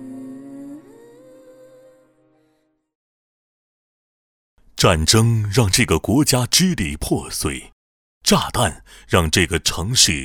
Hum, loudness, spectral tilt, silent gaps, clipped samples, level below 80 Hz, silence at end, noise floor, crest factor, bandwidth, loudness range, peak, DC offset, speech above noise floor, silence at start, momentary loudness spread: none; -17 LUFS; -3.5 dB/octave; 2.95-4.57 s, 7.72-8.21 s; under 0.1%; -36 dBFS; 0 s; -65 dBFS; 20 dB; 19 kHz; 4 LU; -2 dBFS; under 0.1%; 48 dB; 0 s; 21 LU